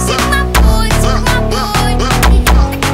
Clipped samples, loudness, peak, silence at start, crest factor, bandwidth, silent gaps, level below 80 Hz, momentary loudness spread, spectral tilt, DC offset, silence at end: under 0.1%; -11 LUFS; 0 dBFS; 0 s; 10 dB; 16.5 kHz; none; -12 dBFS; 3 LU; -4.5 dB/octave; under 0.1%; 0 s